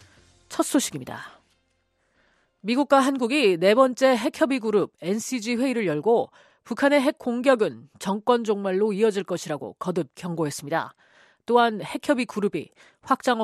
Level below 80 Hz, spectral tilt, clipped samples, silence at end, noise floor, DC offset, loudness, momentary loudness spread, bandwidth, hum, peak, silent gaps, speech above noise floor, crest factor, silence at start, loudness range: -70 dBFS; -4.5 dB/octave; under 0.1%; 0 s; -70 dBFS; under 0.1%; -23 LUFS; 14 LU; 14 kHz; none; -4 dBFS; none; 47 dB; 20 dB; 0.5 s; 5 LU